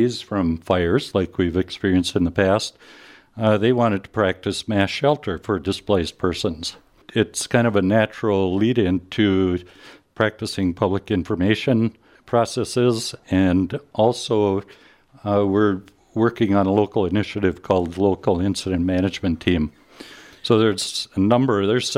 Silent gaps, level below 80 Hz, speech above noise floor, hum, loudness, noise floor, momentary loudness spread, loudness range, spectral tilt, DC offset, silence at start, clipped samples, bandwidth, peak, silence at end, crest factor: none; -46 dBFS; 23 dB; none; -21 LUFS; -43 dBFS; 7 LU; 2 LU; -6 dB/octave; under 0.1%; 0 s; under 0.1%; 15 kHz; -2 dBFS; 0 s; 18 dB